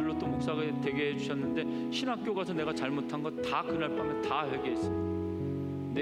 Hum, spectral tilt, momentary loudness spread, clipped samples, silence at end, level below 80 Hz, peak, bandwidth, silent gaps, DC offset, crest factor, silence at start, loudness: none; -6.5 dB/octave; 3 LU; under 0.1%; 0 s; -60 dBFS; -16 dBFS; 11.5 kHz; none; under 0.1%; 16 dB; 0 s; -33 LUFS